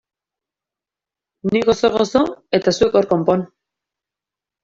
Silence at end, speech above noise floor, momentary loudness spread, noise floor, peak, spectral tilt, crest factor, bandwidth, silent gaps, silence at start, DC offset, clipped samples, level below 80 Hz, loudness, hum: 1.15 s; 72 dB; 6 LU; -88 dBFS; -2 dBFS; -5.5 dB/octave; 18 dB; 7.8 kHz; none; 1.45 s; under 0.1%; under 0.1%; -52 dBFS; -17 LUFS; none